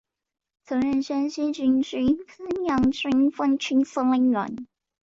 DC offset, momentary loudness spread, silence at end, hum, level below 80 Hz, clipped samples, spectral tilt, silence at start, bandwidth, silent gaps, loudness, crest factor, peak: under 0.1%; 7 LU; 0.4 s; none; -54 dBFS; under 0.1%; -5.5 dB/octave; 0.7 s; 7.6 kHz; none; -24 LUFS; 12 dB; -12 dBFS